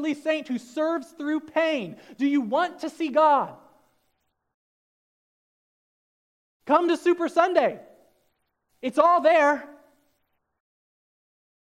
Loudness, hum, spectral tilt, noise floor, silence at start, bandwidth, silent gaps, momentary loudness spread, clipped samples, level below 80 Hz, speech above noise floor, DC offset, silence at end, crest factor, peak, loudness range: -23 LUFS; none; -4.5 dB/octave; -74 dBFS; 0 s; 12 kHz; 4.54-6.60 s; 12 LU; under 0.1%; -80 dBFS; 51 dB; under 0.1%; 2.05 s; 20 dB; -6 dBFS; 5 LU